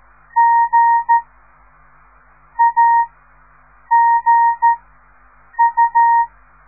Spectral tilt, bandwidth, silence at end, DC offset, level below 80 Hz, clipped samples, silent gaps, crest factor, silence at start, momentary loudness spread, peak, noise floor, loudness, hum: -6.5 dB/octave; 2.4 kHz; 0.4 s; 0.2%; -54 dBFS; under 0.1%; none; 12 dB; 0.35 s; 11 LU; -4 dBFS; -49 dBFS; -14 LUFS; 50 Hz at -55 dBFS